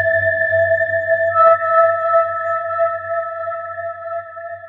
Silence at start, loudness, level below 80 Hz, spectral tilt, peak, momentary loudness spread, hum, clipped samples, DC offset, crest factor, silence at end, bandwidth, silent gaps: 0 s; -16 LUFS; -68 dBFS; -7 dB/octave; -2 dBFS; 14 LU; none; under 0.1%; under 0.1%; 16 dB; 0 s; 4.2 kHz; none